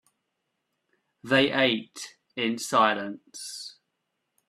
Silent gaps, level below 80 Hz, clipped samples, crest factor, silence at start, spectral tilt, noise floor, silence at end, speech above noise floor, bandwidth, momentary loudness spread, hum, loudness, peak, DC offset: none; -72 dBFS; under 0.1%; 22 dB; 1.25 s; -3.5 dB/octave; -80 dBFS; 0.75 s; 54 dB; 14.5 kHz; 17 LU; none; -24 LUFS; -6 dBFS; under 0.1%